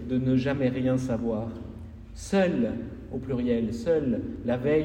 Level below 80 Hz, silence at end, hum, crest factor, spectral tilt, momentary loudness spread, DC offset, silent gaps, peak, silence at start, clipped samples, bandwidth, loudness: -46 dBFS; 0 s; none; 16 dB; -7.5 dB/octave; 14 LU; under 0.1%; none; -12 dBFS; 0 s; under 0.1%; 10 kHz; -27 LUFS